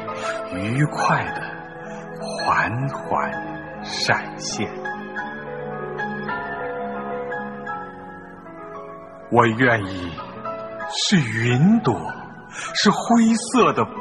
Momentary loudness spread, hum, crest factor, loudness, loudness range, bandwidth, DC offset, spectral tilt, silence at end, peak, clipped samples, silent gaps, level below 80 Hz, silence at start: 18 LU; none; 20 dB; -22 LUFS; 9 LU; 11.5 kHz; 0.2%; -5 dB/octave; 0 s; -2 dBFS; under 0.1%; none; -56 dBFS; 0 s